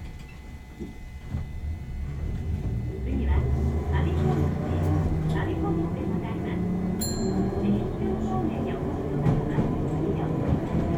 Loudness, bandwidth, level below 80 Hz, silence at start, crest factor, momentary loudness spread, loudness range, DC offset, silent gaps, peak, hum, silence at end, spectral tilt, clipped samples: -28 LUFS; 15.5 kHz; -34 dBFS; 0 s; 14 dB; 11 LU; 4 LU; under 0.1%; none; -12 dBFS; none; 0 s; -7.5 dB/octave; under 0.1%